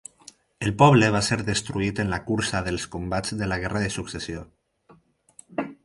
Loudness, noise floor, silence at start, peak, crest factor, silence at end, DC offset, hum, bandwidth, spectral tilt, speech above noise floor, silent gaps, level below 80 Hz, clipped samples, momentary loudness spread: -24 LUFS; -57 dBFS; 0.6 s; -2 dBFS; 24 dB; 0.1 s; under 0.1%; none; 11.5 kHz; -5 dB/octave; 34 dB; none; -46 dBFS; under 0.1%; 16 LU